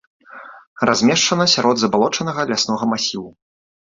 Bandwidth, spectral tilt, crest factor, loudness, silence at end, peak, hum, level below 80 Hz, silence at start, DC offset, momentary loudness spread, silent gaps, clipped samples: 7.8 kHz; -3.5 dB/octave; 18 dB; -17 LUFS; 0.65 s; -2 dBFS; none; -58 dBFS; 0.3 s; under 0.1%; 10 LU; 0.67-0.76 s; under 0.1%